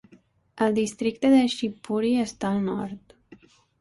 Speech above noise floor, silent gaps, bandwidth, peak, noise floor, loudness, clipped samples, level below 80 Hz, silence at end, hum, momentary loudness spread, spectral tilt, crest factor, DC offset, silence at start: 34 dB; none; 11.5 kHz; -10 dBFS; -58 dBFS; -24 LUFS; under 0.1%; -62 dBFS; 0.45 s; none; 11 LU; -5.5 dB/octave; 16 dB; under 0.1%; 0.55 s